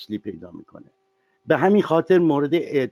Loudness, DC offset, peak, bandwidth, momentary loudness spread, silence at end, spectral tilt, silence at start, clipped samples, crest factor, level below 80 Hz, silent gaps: -19 LUFS; under 0.1%; -4 dBFS; 13.5 kHz; 19 LU; 0 s; -8 dB/octave; 0 s; under 0.1%; 16 dB; -66 dBFS; none